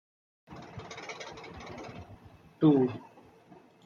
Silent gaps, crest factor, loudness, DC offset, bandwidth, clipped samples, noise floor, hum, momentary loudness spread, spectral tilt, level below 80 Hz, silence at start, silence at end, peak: none; 22 dB; -29 LUFS; under 0.1%; 7.2 kHz; under 0.1%; -57 dBFS; none; 25 LU; -7.5 dB/octave; -64 dBFS; 0.5 s; 0.85 s; -12 dBFS